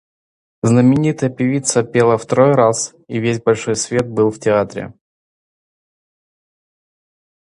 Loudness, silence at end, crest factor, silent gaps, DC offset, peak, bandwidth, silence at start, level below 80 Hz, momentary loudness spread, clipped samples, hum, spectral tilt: -16 LUFS; 2.65 s; 16 dB; none; under 0.1%; 0 dBFS; 11 kHz; 0.65 s; -54 dBFS; 10 LU; under 0.1%; none; -5.5 dB/octave